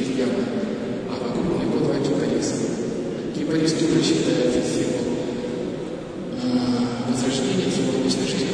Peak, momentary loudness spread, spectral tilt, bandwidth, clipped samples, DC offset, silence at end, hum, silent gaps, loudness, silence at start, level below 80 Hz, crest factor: -6 dBFS; 8 LU; -5 dB/octave; 10.5 kHz; under 0.1%; under 0.1%; 0 s; none; none; -23 LUFS; 0 s; -50 dBFS; 16 dB